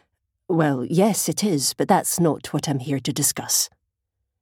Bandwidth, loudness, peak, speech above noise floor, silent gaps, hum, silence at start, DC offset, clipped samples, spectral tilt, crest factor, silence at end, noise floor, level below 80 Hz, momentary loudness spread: 18.5 kHz; -21 LUFS; -4 dBFS; 58 dB; none; none; 0.5 s; under 0.1%; under 0.1%; -4 dB/octave; 18 dB; 0.75 s; -79 dBFS; -62 dBFS; 6 LU